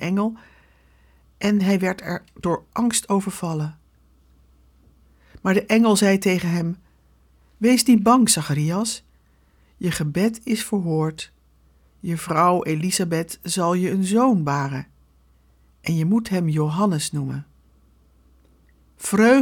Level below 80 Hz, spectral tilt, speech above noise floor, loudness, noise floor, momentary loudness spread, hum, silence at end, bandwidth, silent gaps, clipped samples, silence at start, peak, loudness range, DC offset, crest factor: -54 dBFS; -5 dB/octave; 38 dB; -21 LUFS; -58 dBFS; 13 LU; none; 0 s; 19 kHz; none; under 0.1%; 0 s; -4 dBFS; 6 LU; under 0.1%; 18 dB